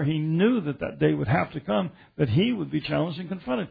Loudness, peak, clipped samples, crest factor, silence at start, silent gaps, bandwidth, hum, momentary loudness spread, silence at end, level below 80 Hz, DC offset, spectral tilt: -26 LUFS; -8 dBFS; under 0.1%; 16 dB; 0 s; none; 5 kHz; none; 7 LU; 0 s; -54 dBFS; under 0.1%; -10.5 dB/octave